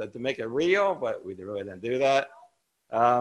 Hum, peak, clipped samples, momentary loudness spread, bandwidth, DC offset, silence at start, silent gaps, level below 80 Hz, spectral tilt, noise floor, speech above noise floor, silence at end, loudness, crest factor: none; -8 dBFS; under 0.1%; 12 LU; 11.5 kHz; under 0.1%; 0 s; none; -68 dBFS; -5 dB/octave; -61 dBFS; 34 dB; 0 s; -27 LUFS; 18 dB